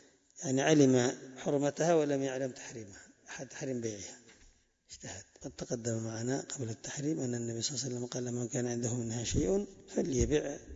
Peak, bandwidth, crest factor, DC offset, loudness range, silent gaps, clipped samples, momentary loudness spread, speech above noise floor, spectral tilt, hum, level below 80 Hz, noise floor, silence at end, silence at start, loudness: -14 dBFS; 8 kHz; 20 dB; under 0.1%; 10 LU; none; under 0.1%; 17 LU; 31 dB; -5 dB/octave; none; -52 dBFS; -64 dBFS; 0 s; 0.35 s; -33 LUFS